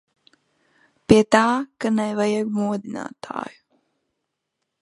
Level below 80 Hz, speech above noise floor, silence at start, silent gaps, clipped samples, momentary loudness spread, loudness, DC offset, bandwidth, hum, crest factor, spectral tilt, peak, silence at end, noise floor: -54 dBFS; 59 dB; 1.1 s; none; under 0.1%; 17 LU; -21 LUFS; under 0.1%; 11.5 kHz; none; 22 dB; -5.5 dB/octave; 0 dBFS; 1.3 s; -79 dBFS